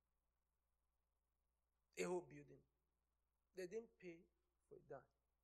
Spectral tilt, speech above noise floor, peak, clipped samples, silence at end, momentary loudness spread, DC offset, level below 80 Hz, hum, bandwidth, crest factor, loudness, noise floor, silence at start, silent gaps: -5 dB/octave; over 37 dB; -34 dBFS; under 0.1%; 0.4 s; 20 LU; under 0.1%; -88 dBFS; none; 10 kHz; 24 dB; -54 LUFS; under -90 dBFS; 1.95 s; none